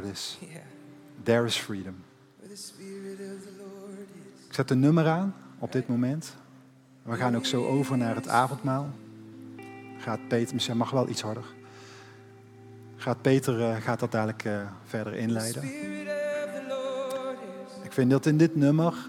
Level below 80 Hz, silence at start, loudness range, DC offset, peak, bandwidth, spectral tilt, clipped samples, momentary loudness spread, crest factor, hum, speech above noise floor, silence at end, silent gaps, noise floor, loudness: -76 dBFS; 0 s; 5 LU; under 0.1%; -8 dBFS; 16.5 kHz; -6 dB/octave; under 0.1%; 22 LU; 20 dB; none; 27 dB; 0 s; none; -55 dBFS; -28 LUFS